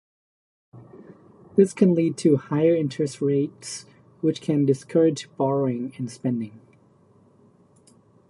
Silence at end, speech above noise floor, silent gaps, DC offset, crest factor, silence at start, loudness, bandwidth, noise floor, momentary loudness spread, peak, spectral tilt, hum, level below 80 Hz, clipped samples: 1.7 s; 35 dB; none; under 0.1%; 20 dB; 0.75 s; -23 LUFS; 11.5 kHz; -57 dBFS; 11 LU; -4 dBFS; -7 dB/octave; none; -70 dBFS; under 0.1%